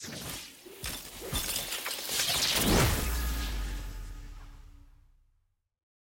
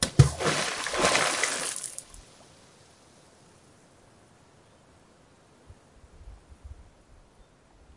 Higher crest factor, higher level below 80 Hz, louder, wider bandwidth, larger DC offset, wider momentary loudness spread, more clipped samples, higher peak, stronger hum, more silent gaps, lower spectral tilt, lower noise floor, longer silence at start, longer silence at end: second, 18 dB vs 28 dB; first, -40 dBFS vs -48 dBFS; second, -30 LUFS vs -25 LUFS; first, 17 kHz vs 11.5 kHz; neither; second, 21 LU vs 28 LU; neither; second, -16 dBFS vs -2 dBFS; neither; neither; about the same, -3 dB/octave vs -3.5 dB/octave; first, -73 dBFS vs -58 dBFS; about the same, 0 s vs 0 s; first, 1.3 s vs 1.15 s